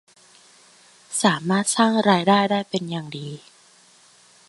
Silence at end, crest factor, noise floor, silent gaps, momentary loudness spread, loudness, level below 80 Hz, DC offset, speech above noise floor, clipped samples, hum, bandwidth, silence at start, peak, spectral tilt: 1.1 s; 20 dB; -54 dBFS; none; 16 LU; -20 LUFS; -68 dBFS; under 0.1%; 33 dB; under 0.1%; none; 11.5 kHz; 1.1 s; -2 dBFS; -4 dB/octave